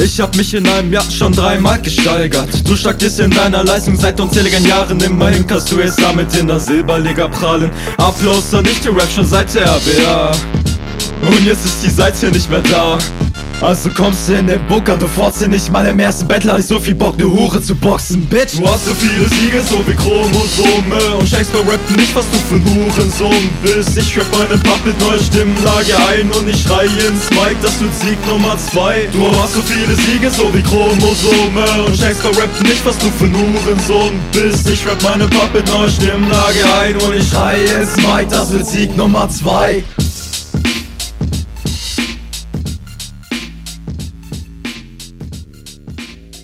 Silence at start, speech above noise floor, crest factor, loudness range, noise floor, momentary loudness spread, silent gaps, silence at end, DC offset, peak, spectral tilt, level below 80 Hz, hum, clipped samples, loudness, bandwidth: 0 s; 21 dB; 12 dB; 5 LU; -33 dBFS; 10 LU; none; 0 s; under 0.1%; 0 dBFS; -4.5 dB/octave; -24 dBFS; none; under 0.1%; -12 LUFS; 16.5 kHz